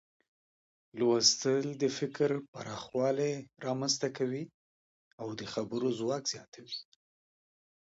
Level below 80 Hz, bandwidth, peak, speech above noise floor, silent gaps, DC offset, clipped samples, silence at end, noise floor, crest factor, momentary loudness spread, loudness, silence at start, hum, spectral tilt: -76 dBFS; 8 kHz; -12 dBFS; over 57 dB; 2.48-2.53 s, 4.54-5.18 s, 6.48-6.52 s; under 0.1%; under 0.1%; 1.1 s; under -90 dBFS; 22 dB; 17 LU; -32 LUFS; 0.95 s; none; -3.5 dB/octave